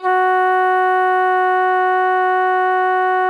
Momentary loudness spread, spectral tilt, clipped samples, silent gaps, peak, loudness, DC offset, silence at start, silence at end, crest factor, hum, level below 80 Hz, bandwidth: 1 LU; -2.5 dB/octave; under 0.1%; none; -6 dBFS; -15 LUFS; under 0.1%; 0 s; 0 s; 8 dB; none; -88 dBFS; 10 kHz